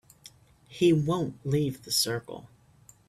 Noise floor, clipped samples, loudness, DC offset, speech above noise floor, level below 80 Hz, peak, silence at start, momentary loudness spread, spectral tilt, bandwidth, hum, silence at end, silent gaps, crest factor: -58 dBFS; under 0.1%; -27 LUFS; under 0.1%; 31 dB; -62 dBFS; -12 dBFS; 0.7 s; 21 LU; -5 dB/octave; 15.5 kHz; none; 0.65 s; none; 18 dB